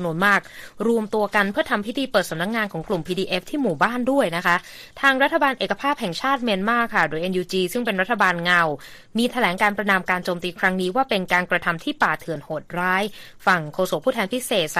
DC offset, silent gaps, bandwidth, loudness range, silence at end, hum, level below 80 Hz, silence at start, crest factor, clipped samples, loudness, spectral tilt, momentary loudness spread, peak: under 0.1%; none; 15.5 kHz; 2 LU; 0 s; none; -54 dBFS; 0 s; 18 dB; under 0.1%; -21 LUFS; -4.5 dB/octave; 6 LU; -4 dBFS